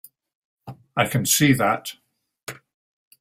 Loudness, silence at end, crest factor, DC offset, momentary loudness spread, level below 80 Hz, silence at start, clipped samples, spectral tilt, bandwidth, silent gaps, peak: -20 LUFS; 0.65 s; 22 dB; under 0.1%; 21 LU; -58 dBFS; 0.65 s; under 0.1%; -4 dB/octave; 16 kHz; 2.43-2.47 s; -4 dBFS